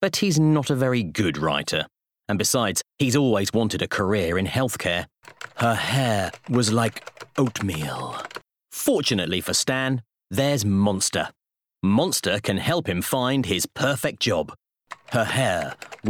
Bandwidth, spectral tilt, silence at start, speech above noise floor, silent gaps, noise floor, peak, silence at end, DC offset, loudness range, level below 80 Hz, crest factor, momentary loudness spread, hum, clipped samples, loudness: over 20 kHz; -4.5 dB/octave; 0 s; 22 dB; none; -45 dBFS; -8 dBFS; 0 s; under 0.1%; 2 LU; -56 dBFS; 14 dB; 12 LU; none; under 0.1%; -23 LUFS